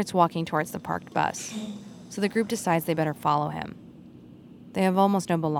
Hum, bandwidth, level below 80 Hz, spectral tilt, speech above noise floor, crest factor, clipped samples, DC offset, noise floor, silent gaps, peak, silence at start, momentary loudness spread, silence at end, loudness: none; 17.5 kHz; -64 dBFS; -5.5 dB/octave; 22 dB; 20 dB; under 0.1%; under 0.1%; -48 dBFS; none; -8 dBFS; 0 s; 14 LU; 0 s; -26 LUFS